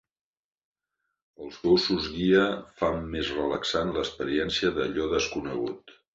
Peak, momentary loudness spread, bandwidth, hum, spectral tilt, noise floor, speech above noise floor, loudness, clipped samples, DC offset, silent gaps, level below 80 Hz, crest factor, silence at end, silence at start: -10 dBFS; 10 LU; 8 kHz; none; -5 dB/octave; -82 dBFS; 56 dB; -27 LUFS; under 0.1%; under 0.1%; none; -50 dBFS; 18 dB; 0.25 s; 1.4 s